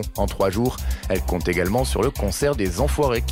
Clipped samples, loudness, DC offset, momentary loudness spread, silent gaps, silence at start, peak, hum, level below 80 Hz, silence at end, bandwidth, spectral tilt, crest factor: under 0.1%; -22 LUFS; under 0.1%; 4 LU; none; 0 s; -10 dBFS; none; -28 dBFS; 0 s; 16.5 kHz; -5.5 dB/octave; 12 dB